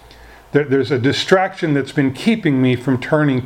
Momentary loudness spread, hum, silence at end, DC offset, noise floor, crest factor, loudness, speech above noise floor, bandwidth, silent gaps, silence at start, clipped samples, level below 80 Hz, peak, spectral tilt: 4 LU; none; 0 s; under 0.1%; -42 dBFS; 16 dB; -17 LUFS; 26 dB; 12.5 kHz; none; 0.55 s; under 0.1%; -50 dBFS; 0 dBFS; -6.5 dB/octave